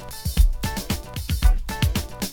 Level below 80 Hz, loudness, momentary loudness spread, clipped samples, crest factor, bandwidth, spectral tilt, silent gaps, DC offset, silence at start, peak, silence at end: -22 dBFS; -25 LUFS; 6 LU; under 0.1%; 16 dB; 17.5 kHz; -4.5 dB/octave; none; under 0.1%; 0 s; -6 dBFS; 0 s